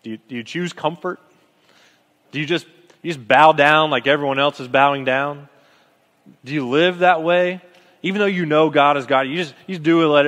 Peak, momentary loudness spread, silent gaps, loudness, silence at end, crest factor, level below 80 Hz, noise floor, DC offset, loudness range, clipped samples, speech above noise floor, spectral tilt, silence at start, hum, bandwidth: 0 dBFS; 15 LU; none; -17 LUFS; 0 s; 18 dB; -70 dBFS; -58 dBFS; under 0.1%; 4 LU; under 0.1%; 40 dB; -5.5 dB/octave; 0.05 s; none; 11.5 kHz